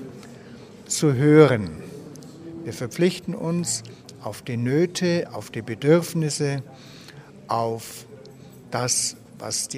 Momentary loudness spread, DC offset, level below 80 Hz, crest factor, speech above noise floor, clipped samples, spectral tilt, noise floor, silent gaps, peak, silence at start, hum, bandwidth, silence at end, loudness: 24 LU; under 0.1%; -60 dBFS; 24 dB; 22 dB; under 0.1%; -5 dB/octave; -44 dBFS; none; 0 dBFS; 0 s; none; 15.5 kHz; 0 s; -23 LUFS